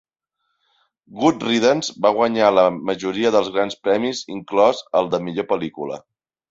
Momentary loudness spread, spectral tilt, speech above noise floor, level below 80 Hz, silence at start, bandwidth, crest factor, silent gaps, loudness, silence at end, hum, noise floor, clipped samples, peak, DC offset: 9 LU; -4.5 dB/octave; 56 dB; -60 dBFS; 1.1 s; 8 kHz; 18 dB; none; -19 LUFS; 0.5 s; none; -75 dBFS; under 0.1%; -2 dBFS; under 0.1%